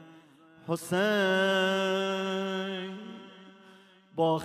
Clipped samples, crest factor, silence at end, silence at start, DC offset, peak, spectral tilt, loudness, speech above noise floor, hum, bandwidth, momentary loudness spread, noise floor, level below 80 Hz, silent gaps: under 0.1%; 16 dB; 0 s; 0 s; under 0.1%; -14 dBFS; -5 dB/octave; -29 LUFS; 29 dB; none; 13.5 kHz; 20 LU; -56 dBFS; -78 dBFS; none